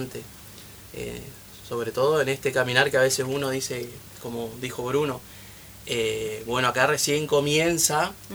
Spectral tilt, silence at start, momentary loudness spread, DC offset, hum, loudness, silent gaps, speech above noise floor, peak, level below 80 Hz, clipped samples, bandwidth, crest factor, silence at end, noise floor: -3 dB/octave; 0 s; 21 LU; under 0.1%; none; -24 LUFS; none; 19 dB; -2 dBFS; -54 dBFS; under 0.1%; over 20 kHz; 24 dB; 0 s; -45 dBFS